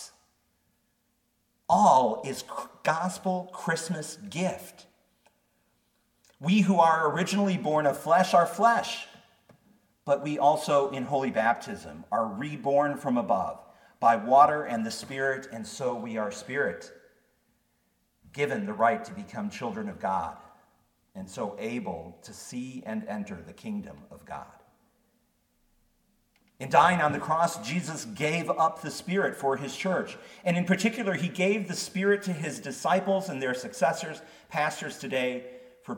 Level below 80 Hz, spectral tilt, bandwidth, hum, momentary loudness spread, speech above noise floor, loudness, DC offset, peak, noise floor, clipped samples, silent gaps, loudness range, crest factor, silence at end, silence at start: -70 dBFS; -5 dB/octave; 18 kHz; none; 18 LU; 46 dB; -27 LUFS; under 0.1%; -6 dBFS; -73 dBFS; under 0.1%; none; 11 LU; 22 dB; 0 s; 0 s